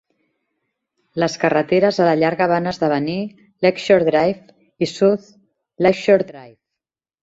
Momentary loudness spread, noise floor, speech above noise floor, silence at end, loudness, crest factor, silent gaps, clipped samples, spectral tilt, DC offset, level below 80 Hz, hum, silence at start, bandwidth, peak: 10 LU; -85 dBFS; 68 dB; 0.75 s; -18 LUFS; 18 dB; none; under 0.1%; -6 dB/octave; under 0.1%; -58 dBFS; none; 1.15 s; 8 kHz; -2 dBFS